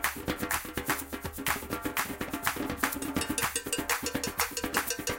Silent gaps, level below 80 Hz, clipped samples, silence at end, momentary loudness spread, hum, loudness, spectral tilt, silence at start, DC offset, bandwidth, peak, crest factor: none; -50 dBFS; under 0.1%; 0 s; 3 LU; none; -31 LUFS; -2.5 dB/octave; 0 s; under 0.1%; 17 kHz; -8 dBFS; 24 dB